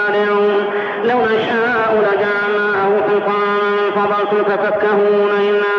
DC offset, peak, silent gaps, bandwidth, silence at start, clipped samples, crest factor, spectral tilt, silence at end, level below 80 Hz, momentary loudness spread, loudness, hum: under 0.1%; -6 dBFS; none; 6 kHz; 0 s; under 0.1%; 8 dB; -6.5 dB/octave; 0 s; -60 dBFS; 2 LU; -15 LUFS; none